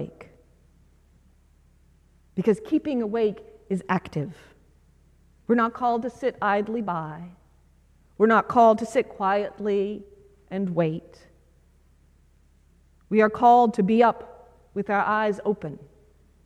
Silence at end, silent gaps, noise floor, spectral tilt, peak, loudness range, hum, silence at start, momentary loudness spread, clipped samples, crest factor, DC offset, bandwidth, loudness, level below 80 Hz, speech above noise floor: 0.6 s; none; -59 dBFS; -7 dB/octave; -6 dBFS; 7 LU; none; 0 s; 19 LU; under 0.1%; 20 dB; under 0.1%; 10.5 kHz; -23 LUFS; -58 dBFS; 36 dB